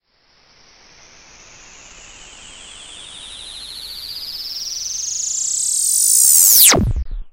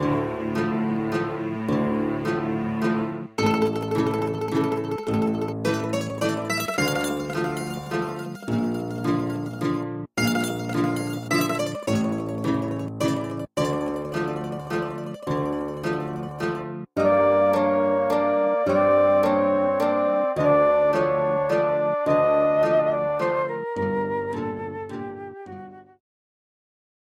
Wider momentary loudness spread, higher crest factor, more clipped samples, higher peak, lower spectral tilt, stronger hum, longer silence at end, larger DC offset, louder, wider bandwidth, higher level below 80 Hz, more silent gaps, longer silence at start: first, 26 LU vs 10 LU; about the same, 18 dB vs 14 dB; neither; first, 0 dBFS vs -10 dBFS; second, -1 dB/octave vs -6 dB/octave; neither; second, 0.05 s vs 1.2 s; neither; first, -12 LUFS vs -24 LUFS; about the same, 16.5 kHz vs 16.5 kHz; first, -34 dBFS vs -56 dBFS; neither; first, 1.95 s vs 0 s